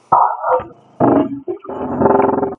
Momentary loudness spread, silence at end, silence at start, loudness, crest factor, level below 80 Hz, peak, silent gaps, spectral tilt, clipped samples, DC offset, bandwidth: 13 LU; 0.05 s; 0.1 s; -16 LUFS; 16 dB; -52 dBFS; 0 dBFS; none; -10.5 dB/octave; under 0.1%; under 0.1%; 3.4 kHz